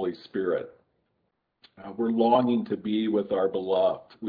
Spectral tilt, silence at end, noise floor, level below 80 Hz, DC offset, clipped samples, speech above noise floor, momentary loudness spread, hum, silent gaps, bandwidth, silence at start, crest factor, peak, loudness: -9.5 dB/octave; 0 s; -76 dBFS; -72 dBFS; under 0.1%; under 0.1%; 50 dB; 10 LU; none; none; 5 kHz; 0 s; 18 dB; -8 dBFS; -26 LUFS